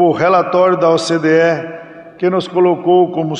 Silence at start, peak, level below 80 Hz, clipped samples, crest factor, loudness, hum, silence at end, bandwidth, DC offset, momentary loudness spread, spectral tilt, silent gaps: 0 s; -2 dBFS; -60 dBFS; under 0.1%; 12 dB; -13 LUFS; none; 0 s; 10.5 kHz; under 0.1%; 8 LU; -6 dB/octave; none